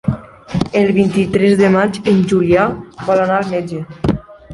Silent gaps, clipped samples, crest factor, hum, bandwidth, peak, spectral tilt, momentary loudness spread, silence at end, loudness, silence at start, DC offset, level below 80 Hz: none; under 0.1%; 14 dB; none; 11.5 kHz; -2 dBFS; -7.5 dB/octave; 12 LU; 0 s; -15 LUFS; 0.05 s; under 0.1%; -38 dBFS